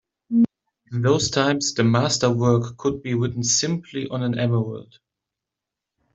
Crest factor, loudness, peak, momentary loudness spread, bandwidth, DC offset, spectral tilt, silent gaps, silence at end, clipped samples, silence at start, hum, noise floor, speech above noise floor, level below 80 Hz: 18 dB; -22 LUFS; -4 dBFS; 8 LU; 8.2 kHz; under 0.1%; -4.5 dB/octave; none; 1.3 s; under 0.1%; 0.3 s; none; -86 dBFS; 64 dB; -56 dBFS